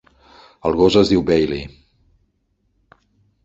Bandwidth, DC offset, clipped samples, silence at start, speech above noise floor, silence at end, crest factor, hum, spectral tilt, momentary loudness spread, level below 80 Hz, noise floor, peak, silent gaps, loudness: 8 kHz; under 0.1%; under 0.1%; 0.65 s; 51 dB; 1.75 s; 18 dB; none; -6.5 dB/octave; 14 LU; -42 dBFS; -67 dBFS; -2 dBFS; none; -17 LUFS